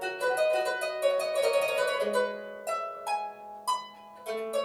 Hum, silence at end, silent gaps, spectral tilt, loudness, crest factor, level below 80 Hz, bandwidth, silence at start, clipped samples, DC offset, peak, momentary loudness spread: none; 0 s; none; -1.5 dB/octave; -30 LUFS; 16 dB; -76 dBFS; 17 kHz; 0 s; under 0.1%; under 0.1%; -14 dBFS; 11 LU